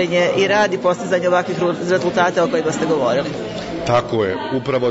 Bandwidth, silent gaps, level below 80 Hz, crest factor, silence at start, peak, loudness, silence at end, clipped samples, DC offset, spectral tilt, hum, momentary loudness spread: 8 kHz; none; -50 dBFS; 14 dB; 0 s; -4 dBFS; -18 LUFS; 0 s; under 0.1%; under 0.1%; -5 dB/octave; none; 6 LU